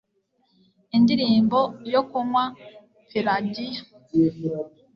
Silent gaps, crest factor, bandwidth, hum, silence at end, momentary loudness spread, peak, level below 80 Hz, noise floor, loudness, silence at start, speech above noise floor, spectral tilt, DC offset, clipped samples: none; 16 dB; 6.4 kHz; none; 0.25 s; 12 LU; -8 dBFS; -64 dBFS; -69 dBFS; -23 LUFS; 0.95 s; 47 dB; -7.5 dB/octave; under 0.1%; under 0.1%